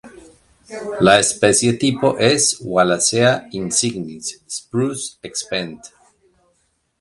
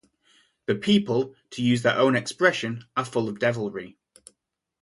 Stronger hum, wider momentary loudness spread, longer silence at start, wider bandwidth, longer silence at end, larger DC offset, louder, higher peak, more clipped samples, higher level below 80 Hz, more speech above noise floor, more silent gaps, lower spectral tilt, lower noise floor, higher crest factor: neither; first, 15 LU vs 12 LU; second, 0.05 s vs 0.7 s; about the same, 11.5 kHz vs 11.5 kHz; first, 1.15 s vs 0.9 s; neither; first, -17 LUFS vs -24 LUFS; first, 0 dBFS vs -4 dBFS; neither; first, -54 dBFS vs -64 dBFS; second, 48 dB vs 52 dB; neither; second, -3.5 dB/octave vs -5.5 dB/octave; second, -65 dBFS vs -76 dBFS; about the same, 18 dB vs 22 dB